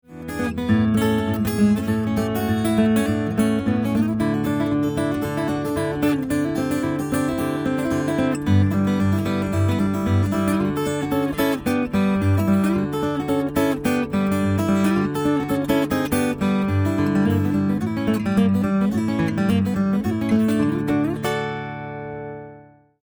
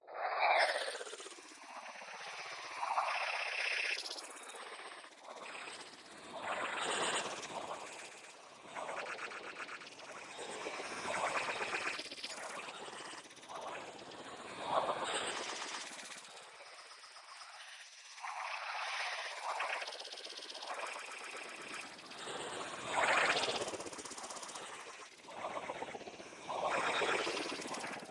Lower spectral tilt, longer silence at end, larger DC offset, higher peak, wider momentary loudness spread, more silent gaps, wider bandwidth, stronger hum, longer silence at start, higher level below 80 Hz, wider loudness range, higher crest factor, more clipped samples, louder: first, -7 dB/octave vs -1 dB/octave; first, 0.4 s vs 0 s; neither; first, -6 dBFS vs -18 dBFS; second, 5 LU vs 16 LU; neither; first, over 20 kHz vs 11.5 kHz; neither; about the same, 0.1 s vs 0.05 s; first, -44 dBFS vs -82 dBFS; second, 2 LU vs 7 LU; second, 14 dB vs 24 dB; neither; first, -21 LUFS vs -40 LUFS